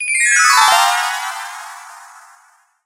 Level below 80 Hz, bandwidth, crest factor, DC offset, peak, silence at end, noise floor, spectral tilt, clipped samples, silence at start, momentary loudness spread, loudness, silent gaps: -66 dBFS; 17.5 kHz; 16 dB; under 0.1%; 0 dBFS; 0.8 s; -53 dBFS; 4.5 dB/octave; under 0.1%; 0 s; 22 LU; -12 LUFS; none